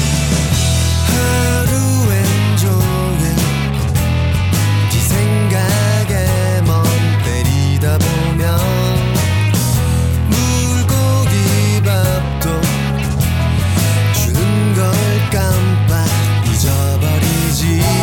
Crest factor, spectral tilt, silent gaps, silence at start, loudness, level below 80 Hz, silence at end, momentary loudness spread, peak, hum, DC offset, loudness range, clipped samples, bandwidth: 10 dB; -5 dB/octave; none; 0 s; -14 LUFS; -26 dBFS; 0 s; 2 LU; -2 dBFS; none; under 0.1%; 1 LU; under 0.1%; 18.5 kHz